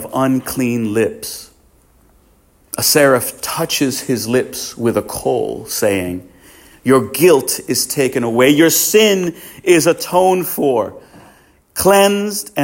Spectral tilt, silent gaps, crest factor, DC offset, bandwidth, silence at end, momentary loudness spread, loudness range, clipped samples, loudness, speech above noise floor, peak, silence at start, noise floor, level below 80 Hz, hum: -3.5 dB/octave; none; 16 dB; under 0.1%; 17 kHz; 0 s; 12 LU; 5 LU; under 0.1%; -15 LUFS; 38 dB; 0 dBFS; 0 s; -52 dBFS; -50 dBFS; none